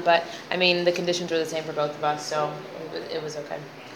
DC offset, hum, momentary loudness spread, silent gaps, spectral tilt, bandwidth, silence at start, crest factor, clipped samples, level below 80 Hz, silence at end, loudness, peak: under 0.1%; none; 14 LU; none; -4 dB/octave; 17 kHz; 0 s; 20 dB; under 0.1%; -76 dBFS; 0 s; -26 LUFS; -6 dBFS